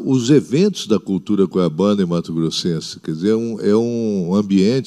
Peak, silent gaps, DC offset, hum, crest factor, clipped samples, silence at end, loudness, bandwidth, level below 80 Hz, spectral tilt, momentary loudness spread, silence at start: -2 dBFS; none; under 0.1%; none; 16 dB; under 0.1%; 0 s; -18 LUFS; 12 kHz; -58 dBFS; -6.5 dB/octave; 6 LU; 0 s